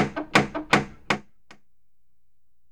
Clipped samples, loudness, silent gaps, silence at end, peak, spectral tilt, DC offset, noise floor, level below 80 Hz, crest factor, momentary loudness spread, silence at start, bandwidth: under 0.1%; -24 LUFS; none; 1.5 s; -6 dBFS; -4.5 dB/octave; 0.4%; -76 dBFS; -52 dBFS; 22 dB; 7 LU; 0 s; 19.5 kHz